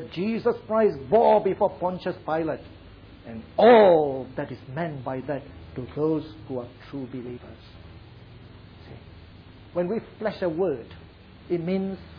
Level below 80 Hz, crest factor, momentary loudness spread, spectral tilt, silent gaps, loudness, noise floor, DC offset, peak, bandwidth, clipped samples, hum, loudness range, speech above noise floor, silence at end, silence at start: -54 dBFS; 20 dB; 21 LU; -9.5 dB/octave; none; -24 LUFS; -47 dBFS; under 0.1%; -6 dBFS; 5.4 kHz; under 0.1%; none; 14 LU; 23 dB; 0 s; 0 s